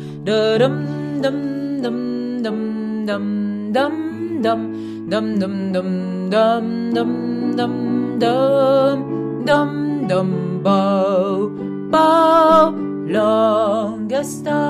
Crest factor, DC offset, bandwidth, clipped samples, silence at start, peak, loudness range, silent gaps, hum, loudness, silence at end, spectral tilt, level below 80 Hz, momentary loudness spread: 16 dB; under 0.1%; 14 kHz; under 0.1%; 0 s; -2 dBFS; 6 LU; none; none; -18 LUFS; 0 s; -6.5 dB/octave; -58 dBFS; 9 LU